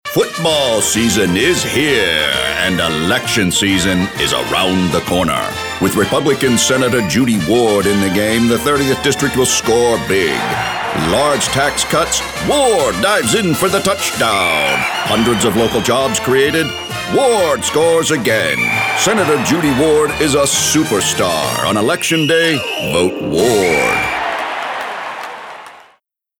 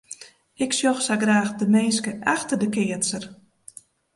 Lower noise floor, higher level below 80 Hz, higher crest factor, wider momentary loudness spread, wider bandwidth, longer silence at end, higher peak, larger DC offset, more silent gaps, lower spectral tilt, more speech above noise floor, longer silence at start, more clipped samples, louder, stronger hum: first, -55 dBFS vs -48 dBFS; first, -40 dBFS vs -66 dBFS; second, 12 dB vs 18 dB; second, 5 LU vs 13 LU; first, over 20 kHz vs 11.5 kHz; second, 0.6 s vs 0.8 s; first, -2 dBFS vs -6 dBFS; neither; neither; about the same, -3.5 dB/octave vs -3.5 dB/octave; first, 42 dB vs 26 dB; about the same, 0.05 s vs 0.1 s; neither; first, -13 LUFS vs -22 LUFS; neither